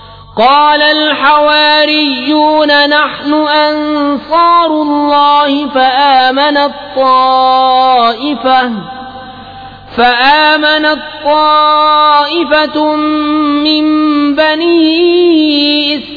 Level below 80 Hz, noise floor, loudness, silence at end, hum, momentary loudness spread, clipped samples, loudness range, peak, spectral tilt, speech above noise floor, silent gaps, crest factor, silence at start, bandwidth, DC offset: -46 dBFS; -29 dBFS; -8 LUFS; 0 s; none; 7 LU; under 0.1%; 2 LU; 0 dBFS; -5 dB/octave; 20 dB; none; 8 dB; 0 s; 5 kHz; under 0.1%